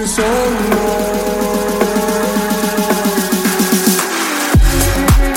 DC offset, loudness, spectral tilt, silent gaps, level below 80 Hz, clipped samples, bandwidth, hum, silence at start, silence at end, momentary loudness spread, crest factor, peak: under 0.1%; -14 LUFS; -4.5 dB/octave; none; -20 dBFS; under 0.1%; 17 kHz; none; 0 s; 0 s; 4 LU; 12 dB; 0 dBFS